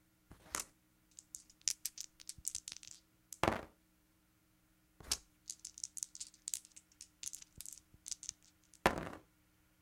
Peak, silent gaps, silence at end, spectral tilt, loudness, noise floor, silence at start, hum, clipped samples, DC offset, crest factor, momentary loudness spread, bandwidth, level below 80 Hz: -8 dBFS; none; 0.6 s; -2 dB/octave; -43 LUFS; -74 dBFS; 0.3 s; none; under 0.1%; under 0.1%; 38 dB; 20 LU; 16.5 kHz; -64 dBFS